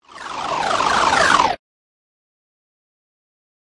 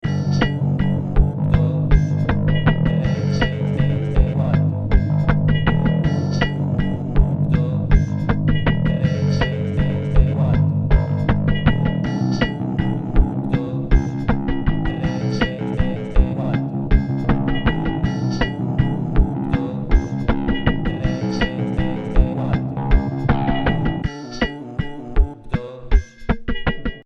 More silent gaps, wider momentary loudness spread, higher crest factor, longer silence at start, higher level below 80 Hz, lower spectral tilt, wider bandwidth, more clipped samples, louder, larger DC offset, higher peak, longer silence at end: neither; first, 15 LU vs 5 LU; about the same, 20 dB vs 18 dB; about the same, 0.15 s vs 0.05 s; second, -50 dBFS vs -22 dBFS; second, -2 dB/octave vs -8 dB/octave; first, 11.5 kHz vs 6.6 kHz; neither; first, -17 LUFS vs -20 LUFS; neither; about the same, -2 dBFS vs 0 dBFS; first, 2.1 s vs 0.05 s